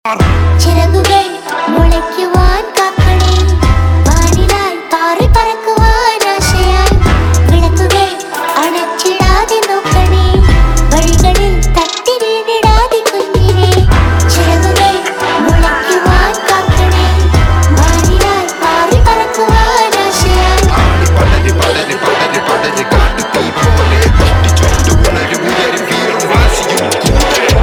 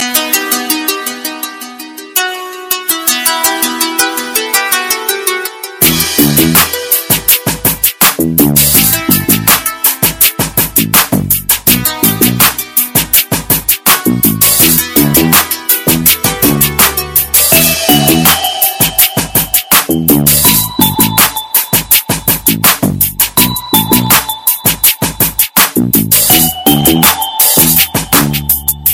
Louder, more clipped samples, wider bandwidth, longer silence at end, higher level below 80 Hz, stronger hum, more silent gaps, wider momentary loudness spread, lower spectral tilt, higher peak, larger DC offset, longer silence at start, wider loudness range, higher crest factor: about the same, -10 LUFS vs -8 LUFS; about the same, 0.8% vs 0.6%; second, 17.5 kHz vs over 20 kHz; about the same, 0 s vs 0 s; first, -14 dBFS vs -34 dBFS; neither; neither; about the same, 4 LU vs 6 LU; first, -4.5 dB/octave vs -2.5 dB/octave; about the same, 0 dBFS vs 0 dBFS; neither; about the same, 0.05 s vs 0 s; second, 1 LU vs 4 LU; about the same, 8 dB vs 10 dB